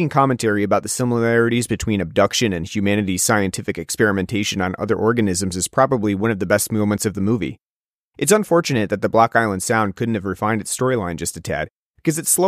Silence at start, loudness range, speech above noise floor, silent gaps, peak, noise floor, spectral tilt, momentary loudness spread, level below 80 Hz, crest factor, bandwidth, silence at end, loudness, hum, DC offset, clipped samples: 0 s; 1 LU; over 71 dB; 7.62-7.85 s, 7.94-8.11 s, 11.70-11.94 s; -2 dBFS; under -90 dBFS; -4.5 dB/octave; 7 LU; -48 dBFS; 18 dB; 15.5 kHz; 0 s; -19 LUFS; none; under 0.1%; under 0.1%